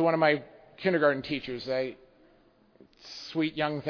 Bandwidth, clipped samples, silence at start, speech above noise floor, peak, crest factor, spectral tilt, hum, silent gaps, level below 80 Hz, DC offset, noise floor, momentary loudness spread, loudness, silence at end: 5.4 kHz; under 0.1%; 0 s; 34 dB; -10 dBFS; 20 dB; -6.5 dB/octave; none; none; -66 dBFS; under 0.1%; -62 dBFS; 14 LU; -29 LUFS; 0 s